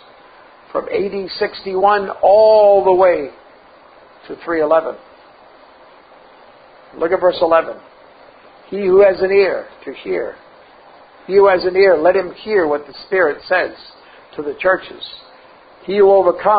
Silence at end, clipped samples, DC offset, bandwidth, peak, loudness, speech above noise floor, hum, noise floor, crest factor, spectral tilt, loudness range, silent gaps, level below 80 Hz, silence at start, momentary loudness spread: 0 s; under 0.1%; under 0.1%; 5 kHz; 0 dBFS; -15 LUFS; 30 dB; none; -44 dBFS; 16 dB; -10 dB/octave; 7 LU; none; -54 dBFS; 0.75 s; 19 LU